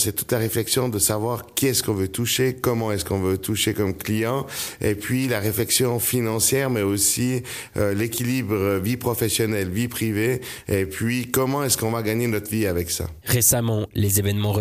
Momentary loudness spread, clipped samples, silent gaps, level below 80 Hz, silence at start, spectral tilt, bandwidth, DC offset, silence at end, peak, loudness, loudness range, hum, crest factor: 6 LU; under 0.1%; none; -48 dBFS; 0 s; -4 dB/octave; 15.5 kHz; under 0.1%; 0 s; -6 dBFS; -22 LUFS; 2 LU; none; 16 dB